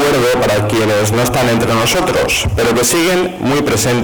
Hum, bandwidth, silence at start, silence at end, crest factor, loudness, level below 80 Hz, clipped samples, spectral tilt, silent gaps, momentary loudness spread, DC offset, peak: none; over 20 kHz; 0 s; 0 s; 6 dB; -13 LUFS; -32 dBFS; under 0.1%; -4 dB/octave; none; 2 LU; 0.7%; -8 dBFS